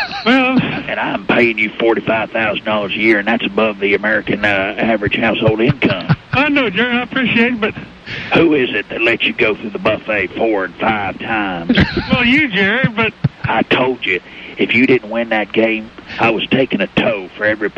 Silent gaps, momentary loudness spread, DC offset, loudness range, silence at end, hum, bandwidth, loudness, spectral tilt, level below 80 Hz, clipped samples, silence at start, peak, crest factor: none; 6 LU; under 0.1%; 1 LU; 0.05 s; none; 7.6 kHz; -15 LUFS; -7 dB/octave; -42 dBFS; under 0.1%; 0 s; -2 dBFS; 14 dB